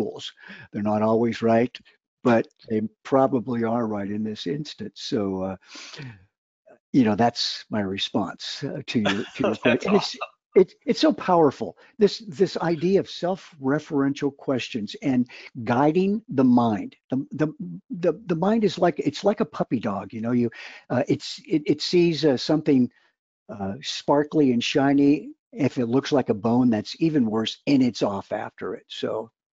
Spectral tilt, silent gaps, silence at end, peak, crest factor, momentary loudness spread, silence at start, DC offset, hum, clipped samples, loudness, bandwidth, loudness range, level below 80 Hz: -6 dB/octave; 2.08-2.17 s, 6.38-6.65 s, 6.80-6.93 s, 10.46-10.50 s, 17.04-17.09 s, 23.19-23.46 s, 25.39-25.51 s; 0.3 s; -6 dBFS; 18 dB; 12 LU; 0 s; under 0.1%; none; under 0.1%; -24 LUFS; 7.8 kHz; 4 LU; -64 dBFS